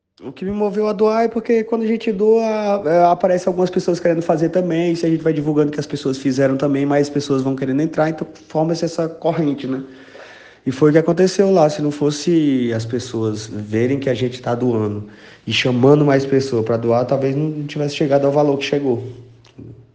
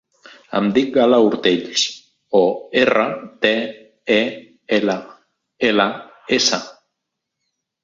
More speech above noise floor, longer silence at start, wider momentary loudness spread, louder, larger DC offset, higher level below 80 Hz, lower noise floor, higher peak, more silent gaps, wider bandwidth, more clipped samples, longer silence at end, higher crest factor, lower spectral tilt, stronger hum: second, 24 dB vs 62 dB; second, 0.2 s vs 0.5 s; about the same, 9 LU vs 11 LU; about the same, -18 LUFS vs -18 LUFS; neither; about the same, -56 dBFS vs -60 dBFS; second, -41 dBFS vs -79 dBFS; about the same, 0 dBFS vs -2 dBFS; neither; first, 9.4 kHz vs 7.8 kHz; neither; second, 0.15 s vs 1.1 s; about the same, 18 dB vs 18 dB; first, -6.5 dB/octave vs -3.5 dB/octave; neither